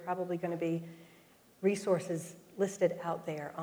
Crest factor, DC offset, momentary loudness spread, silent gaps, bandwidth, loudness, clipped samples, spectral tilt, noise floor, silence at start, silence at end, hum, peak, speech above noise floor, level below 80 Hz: 18 dB; under 0.1%; 9 LU; none; over 20 kHz; -35 LUFS; under 0.1%; -6 dB/octave; -62 dBFS; 0 s; 0 s; none; -16 dBFS; 28 dB; -80 dBFS